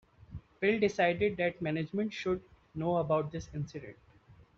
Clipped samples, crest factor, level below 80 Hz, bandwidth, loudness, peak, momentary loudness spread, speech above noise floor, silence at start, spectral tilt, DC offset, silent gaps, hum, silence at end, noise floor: under 0.1%; 18 dB; -60 dBFS; 7.6 kHz; -32 LUFS; -16 dBFS; 19 LU; 28 dB; 0.3 s; -5 dB/octave; under 0.1%; none; none; 0.15 s; -60 dBFS